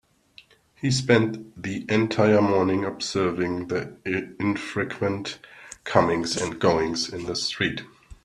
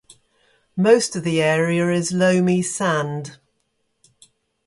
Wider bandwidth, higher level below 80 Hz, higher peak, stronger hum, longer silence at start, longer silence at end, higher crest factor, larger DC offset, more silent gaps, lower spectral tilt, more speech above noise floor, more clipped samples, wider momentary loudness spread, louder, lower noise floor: about the same, 12.5 kHz vs 11.5 kHz; first, -56 dBFS vs -62 dBFS; about the same, -2 dBFS vs -2 dBFS; neither; about the same, 0.8 s vs 0.75 s; second, 0.1 s vs 1.35 s; about the same, 22 dB vs 18 dB; neither; neither; about the same, -5 dB/octave vs -5 dB/octave; second, 30 dB vs 52 dB; neither; about the same, 12 LU vs 12 LU; second, -24 LUFS vs -19 LUFS; second, -54 dBFS vs -70 dBFS